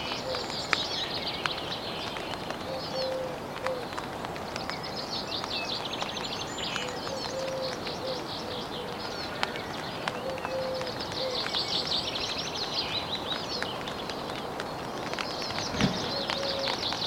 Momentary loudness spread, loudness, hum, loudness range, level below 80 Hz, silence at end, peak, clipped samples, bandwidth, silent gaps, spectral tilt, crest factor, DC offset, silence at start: 7 LU; -32 LUFS; none; 4 LU; -56 dBFS; 0 s; -2 dBFS; under 0.1%; 16.5 kHz; none; -3.5 dB/octave; 30 dB; under 0.1%; 0 s